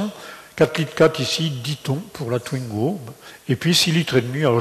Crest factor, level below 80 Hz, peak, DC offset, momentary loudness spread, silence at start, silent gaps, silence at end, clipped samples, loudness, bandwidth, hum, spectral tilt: 16 dB; -56 dBFS; -6 dBFS; under 0.1%; 15 LU; 0 s; none; 0 s; under 0.1%; -21 LUFS; 13.5 kHz; none; -5 dB/octave